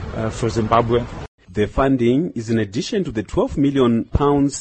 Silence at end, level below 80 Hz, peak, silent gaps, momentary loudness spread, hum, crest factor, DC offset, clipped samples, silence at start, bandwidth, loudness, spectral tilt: 0 s; -34 dBFS; -2 dBFS; 1.28-1.38 s; 7 LU; none; 16 dB; under 0.1%; under 0.1%; 0 s; 8.8 kHz; -19 LUFS; -6.5 dB/octave